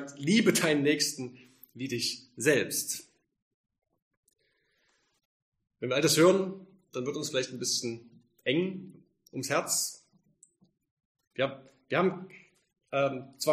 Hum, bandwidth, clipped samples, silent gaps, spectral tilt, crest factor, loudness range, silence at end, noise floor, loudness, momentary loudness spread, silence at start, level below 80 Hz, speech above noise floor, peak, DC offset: none; 15.5 kHz; under 0.1%; 3.42-3.64 s, 4.02-4.11 s, 4.17-4.23 s, 5.25-5.52 s, 10.91-10.97 s, 11.05-11.15 s, 11.27-11.31 s; -3.5 dB/octave; 22 dB; 6 LU; 0 s; -74 dBFS; -29 LUFS; 17 LU; 0 s; -76 dBFS; 45 dB; -10 dBFS; under 0.1%